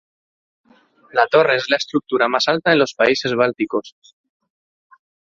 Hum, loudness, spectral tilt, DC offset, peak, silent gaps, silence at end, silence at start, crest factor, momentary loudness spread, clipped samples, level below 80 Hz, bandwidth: none; -17 LUFS; -4 dB/octave; under 0.1%; 0 dBFS; none; 1.35 s; 1.15 s; 18 dB; 8 LU; under 0.1%; -62 dBFS; 7.8 kHz